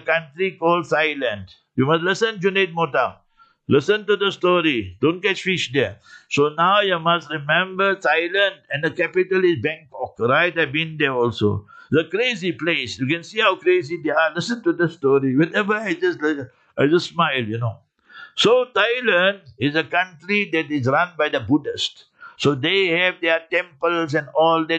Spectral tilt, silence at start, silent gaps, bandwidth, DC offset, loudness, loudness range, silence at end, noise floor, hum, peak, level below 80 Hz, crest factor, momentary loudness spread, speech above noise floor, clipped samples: -5 dB/octave; 0.05 s; none; 8.8 kHz; under 0.1%; -20 LUFS; 2 LU; 0 s; -44 dBFS; none; -4 dBFS; -64 dBFS; 16 dB; 7 LU; 24 dB; under 0.1%